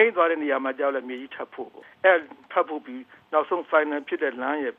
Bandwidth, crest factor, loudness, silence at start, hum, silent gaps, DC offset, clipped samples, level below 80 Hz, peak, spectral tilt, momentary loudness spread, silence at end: 4 kHz; 20 dB; -25 LUFS; 0 s; none; none; under 0.1%; under 0.1%; -82 dBFS; -4 dBFS; -6 dB/octave; 16 LU; 0.05 s